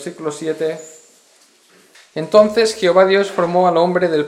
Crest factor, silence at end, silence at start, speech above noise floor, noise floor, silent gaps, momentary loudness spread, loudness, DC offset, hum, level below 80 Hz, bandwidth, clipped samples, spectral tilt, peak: 16 dB; 0 s; 0 s; 37 dB; -52 dBFS; none; 14 LU; -15 LUFS; under 0.1%; none; -60 dBFS; 14 kHz; under 0.1%; -5 dB/octave; 0 dBFS